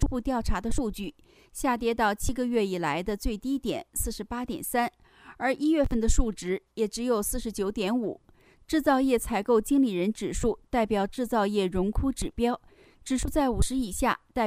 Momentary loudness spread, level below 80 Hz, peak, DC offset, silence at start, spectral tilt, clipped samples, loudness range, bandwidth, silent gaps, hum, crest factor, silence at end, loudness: 8 LU; -36 dBFS; -8 dBFS; under 0.1%; 0 s; -5 dB/octave; under 0.1%; 3 LU; 15.5 kHz; none; none; 18 dB; 0 s; -28 LUFS